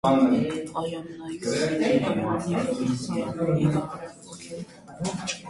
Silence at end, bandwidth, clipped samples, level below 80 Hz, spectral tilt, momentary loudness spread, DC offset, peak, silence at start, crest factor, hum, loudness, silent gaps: 0 s; 11.5 kHz; under 0.1%; -56 dBFS; -6 dB/octave; 16 LU; under 0.1%; -10 dBFS; 0.05 s; 16 dB; none; -26 LUFS; none